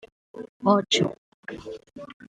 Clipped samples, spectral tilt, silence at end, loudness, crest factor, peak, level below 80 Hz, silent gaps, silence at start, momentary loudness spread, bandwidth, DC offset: under 0.1%; -4.5 dB/octave; 0.05 s; -23 LUFS; 22 dB; -6 dBFS; -64 dBFS; 0.49-0.60 s, 1.18-1.43 s, 2.14-2.20 s; 0.35 s; 22 LU; 9.4 kHz; under 0.1%